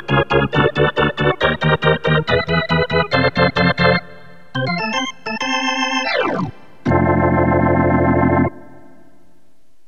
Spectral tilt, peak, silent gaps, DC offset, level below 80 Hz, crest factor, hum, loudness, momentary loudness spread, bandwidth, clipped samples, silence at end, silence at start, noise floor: -6 dB/octave; -2 dBFS; none; 1%; -38 dBFS; 16 dB; none; -16 LUFS; 7 LU; 7.4 kHz; under 0.1%; 1.25 s; 0 s; -60 dBFS